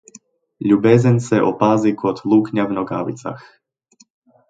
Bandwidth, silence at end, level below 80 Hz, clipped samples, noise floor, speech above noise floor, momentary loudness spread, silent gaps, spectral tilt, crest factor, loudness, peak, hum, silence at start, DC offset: 9 kHz; 1.1 s; -58 dBFS; under 0.1%; -56 dBFS; 39 dB; 13 LU; none; -8 dB/octave; 18 dB; -17 LUFS; 0 dBFS; none; 0.6 s; under 0.1%